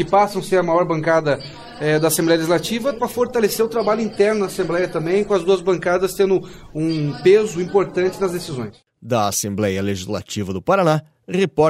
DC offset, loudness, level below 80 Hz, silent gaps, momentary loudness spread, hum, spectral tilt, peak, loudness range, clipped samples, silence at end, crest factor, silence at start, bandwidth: under 0.1%; -19 LUFS; -50 dBFS; none; 9 LU; none; -5 dB/octave; -4 dBFS; 3 LU; under 0.1%; 0 s; 16 dB; 0 s; 16 kHz